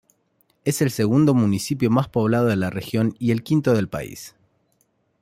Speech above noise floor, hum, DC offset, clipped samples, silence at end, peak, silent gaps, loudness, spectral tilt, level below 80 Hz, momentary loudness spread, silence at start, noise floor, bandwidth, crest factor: 47 dB; none; under 0.1%; under 0.1%; 0.95 s; -4 dBFS; none; -21 LUFS; -6.5 dB/octave; -56 dBFS; 11 LU; 0.65 s; -67 dBFS; 16 kHz; 18 dB